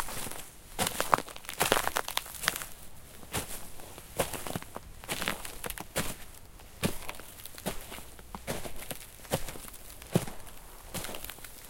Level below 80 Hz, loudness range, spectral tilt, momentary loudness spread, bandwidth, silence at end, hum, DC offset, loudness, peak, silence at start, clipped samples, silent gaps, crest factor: -48 dBFS; 7 LU; -3 dB/octave; 17 LU; 17 kHz; 0 s; none; under 0.1%; -35 LUFS; -2 dBFS; 0 s; under 0.1%; none; 32 dB